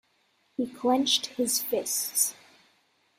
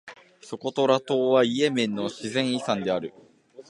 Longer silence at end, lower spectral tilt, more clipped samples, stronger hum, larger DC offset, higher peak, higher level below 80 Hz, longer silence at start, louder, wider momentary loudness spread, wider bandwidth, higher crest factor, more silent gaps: first, 0.85 s vs 0.05 s; second, -1 dB/octave vs -5 dB/octave; neither; neither; neither; second, -10 dBFS vs -6 dBFS; second, -76 dBFS vs -70 dBFS; first, 0.6 s vs 0.05 s; about the same, -26 LUFS vs -25 LUFS; about the same, 11 LU vs 11 LU; first, 16 kHz vs 11.5 kHz; about the same, 20 dB vs 20 dB; neither